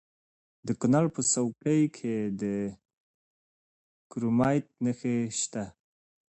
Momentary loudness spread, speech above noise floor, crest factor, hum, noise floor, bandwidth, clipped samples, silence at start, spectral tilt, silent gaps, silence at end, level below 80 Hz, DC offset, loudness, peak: 12 LU; over 62 dB; 18 dB; none; under -90 dBFS; 8.8 kHz; under 0.1%; 0.65 s; -5.5 dB/octave; 2.93-4.10 s; 0.6 s; -64 dBFS; under 0.1%; -29 LUFS; -12 dBFS